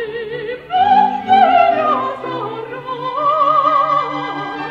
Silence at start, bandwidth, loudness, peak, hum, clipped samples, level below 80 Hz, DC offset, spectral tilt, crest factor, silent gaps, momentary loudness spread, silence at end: 0 s; 7.2 kHz; -15 LUFS; 0 dBFS; none; under 0.1%; -58 dBFS; under 0.1%; -6 dB/octave; 14 dB; none; 13 LU; 0 s